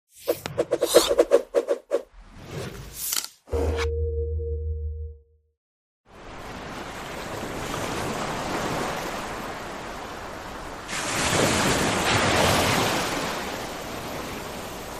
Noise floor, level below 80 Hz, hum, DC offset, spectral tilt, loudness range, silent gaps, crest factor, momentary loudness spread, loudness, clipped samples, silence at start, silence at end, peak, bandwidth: -47 dBFS; -40 dBFS; none; under 0.1%; -3.5 dB/octave; 11 LU; 5.57-6.04 s; 22 dB; 16 LU; -26 LUFS; under 0.1%; 0.15 s; 0 s; -4 dBFS; 15.5 kHz